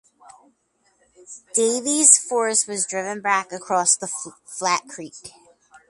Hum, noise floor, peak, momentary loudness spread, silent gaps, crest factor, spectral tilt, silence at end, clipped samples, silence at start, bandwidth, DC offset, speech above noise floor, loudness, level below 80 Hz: none; -66 dBFS; 0 dBFS; 21 LU; none; 22 dB; -1 dB/octave; 0.1 s; under 0.1%; 1.3 s; 11.5 kHz; under 0.1%; 44 dB; -19 LUFS; -72 dBFS